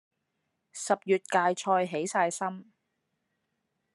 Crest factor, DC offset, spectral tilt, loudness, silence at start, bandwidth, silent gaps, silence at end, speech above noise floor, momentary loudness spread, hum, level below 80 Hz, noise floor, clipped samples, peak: 22 dB; under 0.1%; -4 dB/octave; -28 LUFS; 0.75 s; 12.5 kHz; none; 1.3 s; 52 dB; 12 LU; none; -86 dBFS; -80 dBFS; under 0.1%; -10 dBFS